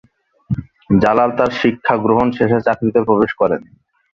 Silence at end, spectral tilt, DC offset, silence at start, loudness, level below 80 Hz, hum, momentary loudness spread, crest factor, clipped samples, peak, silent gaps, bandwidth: 0.5 s; -8 dB/octave; under 0.1%; 0.5 s; -16 LUFS; -44 dBFS; none; 11 LU; 16 dB; under 0.1%; 0 dBFS; none; 7.2 kHz